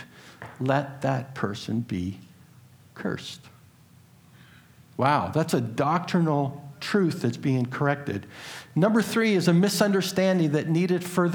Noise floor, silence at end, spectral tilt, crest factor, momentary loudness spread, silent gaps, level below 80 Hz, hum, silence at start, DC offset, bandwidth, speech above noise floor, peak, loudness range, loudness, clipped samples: -54 dBFS; 0 s; -6 dB/octave; 20 dB; 14 LU; none; -66 dBFS; none; 0 s; under 0.1%; 19.5 kHz; 30 dB; -6 dBFS; 11 LU; -25 LUFS; under 0.1%